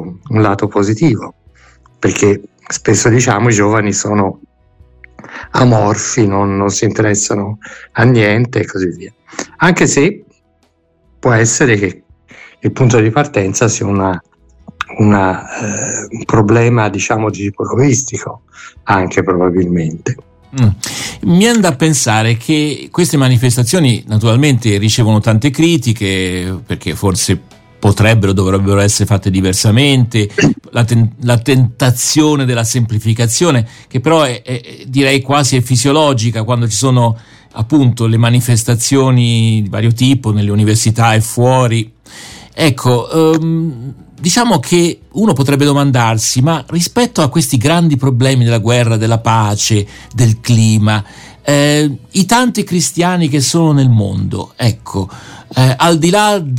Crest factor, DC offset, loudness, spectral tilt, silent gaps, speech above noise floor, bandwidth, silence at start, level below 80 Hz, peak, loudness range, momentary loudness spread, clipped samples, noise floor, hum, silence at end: 12 dB; under 0.1%; -12 LUFS; -5 dB/octave; none; 45 dB; 16.5 kHz; 0 s; -42 dBFS; 0 dBFS; 3 LU; 10 LU; under 0.1%; -56 dBFS; none; 0 s